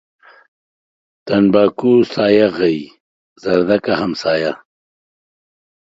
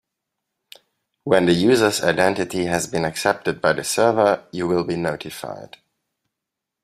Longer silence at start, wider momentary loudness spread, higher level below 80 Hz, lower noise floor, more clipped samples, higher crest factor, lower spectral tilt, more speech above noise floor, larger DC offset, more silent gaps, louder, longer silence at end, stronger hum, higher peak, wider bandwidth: about the same, 1.25 s vs 1.25 s; second, 11 LU vs 14 LU; about the same, -54 dBFS vs -56 dBFS; first, under -90 dBFS vs -83 dBFS; neither; about the same, 16 dB vs 20 dB; first, -7 dB/octave vs -4.5 dB/octave; first, over 76 dB vs 64 dB; neither; first, 3.00-3.36 s vs none; first, -15 LUFS vs -20 LUFS; first, 1.35 s vs 1.2 s; neither; about the same, 0 dBFS vs -2 dBFS; second, 7.8 kHz vs 15.5 kHz